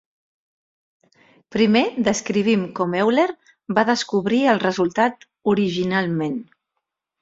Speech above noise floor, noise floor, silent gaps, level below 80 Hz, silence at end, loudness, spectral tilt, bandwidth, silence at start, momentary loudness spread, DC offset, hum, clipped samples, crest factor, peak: 60 dB; -80 dBFS; none; -60 dBFS; 0.8 s; -20 LUFS; -5 dB/octave; 7.8 kHz; 1.5 s; 7 LU; under 0.1%; none; under 0.1%; 20 dB; -2 dBFS